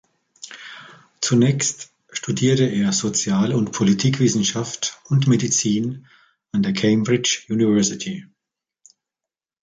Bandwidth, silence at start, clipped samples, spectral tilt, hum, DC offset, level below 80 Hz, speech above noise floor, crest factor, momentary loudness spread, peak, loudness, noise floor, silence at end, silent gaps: 9.6 kHz; 0.45 s; under 0.1%; -4.5 dB/octave; none; under 0.1%; -58 dBFS; 69 dB; 16 dB; 18 LU; -6 dBFS; -20 LUFS; -88 dBFS; 1.55 s; none